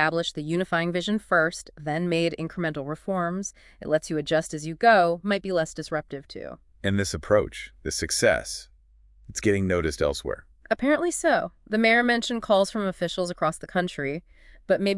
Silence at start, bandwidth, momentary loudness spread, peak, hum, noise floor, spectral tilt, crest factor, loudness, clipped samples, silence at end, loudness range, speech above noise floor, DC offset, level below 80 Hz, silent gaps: 0 s; 12 kHz; 14 LU; -6 dBFS; none; -56 dBFS; -4.5 dB/octave; 20 dB; -25 LUFS; under 0.1%; 0 s; 3 LU; 31 dB; under 0.1%; -50 dBFS; none